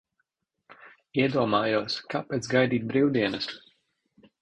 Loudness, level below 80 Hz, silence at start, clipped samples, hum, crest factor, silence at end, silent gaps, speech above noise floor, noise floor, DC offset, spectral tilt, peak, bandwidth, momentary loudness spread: -26 LUFS; -64 dBFS; 0.7 s; under 0.1%; none; 20 dB; 0.85 s; none; 52 dB; -78 dBFS; under 0.1%; -5.5 dB/octave; -8 dBFS; 10 kHz; 9 LU